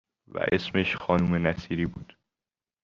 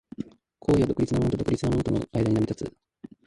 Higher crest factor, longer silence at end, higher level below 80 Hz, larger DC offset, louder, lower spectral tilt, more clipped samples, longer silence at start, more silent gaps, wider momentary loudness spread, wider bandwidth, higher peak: about the same, 20 dB vs 16 dB; first, 0.8 s vs 0.55 s; second, -52 dBFS vs -44 dBFS; neither; about the same, -27 LUFS vs -26 LUFS; about the same, -7.5 dB/octave vs -8 dB/octave; neither; first, 0.35 s vs 0.2 s; neither; second, 9 LU vs 16 LU; second, 7 kHz vs 11.5 kHz; about the same, -8 dBFS vs -10 dBFS